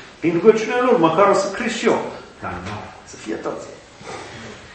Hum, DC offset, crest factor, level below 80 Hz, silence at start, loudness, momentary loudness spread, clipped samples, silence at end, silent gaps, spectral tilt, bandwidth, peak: none; under 0.1%; 20 dB; -54 dBFS; 0 s; -18 LUFS; 20 LU; under 0.1%; 0 s; none; -5 dB/octave; 8.8 kHz; 0 dBFS